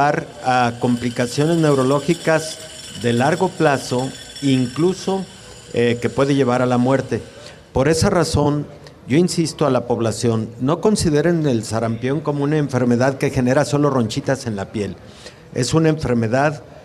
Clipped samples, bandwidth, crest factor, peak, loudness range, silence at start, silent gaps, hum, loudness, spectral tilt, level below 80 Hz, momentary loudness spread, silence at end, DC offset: under 0.1%; 13.5 kHz; 14 dB; -4 dBFS; 2 LU; 0 s; none; none; -19 LUFS; -6 dB/octave; -44 dBFS; 10 LU; 0 s; under 0.1%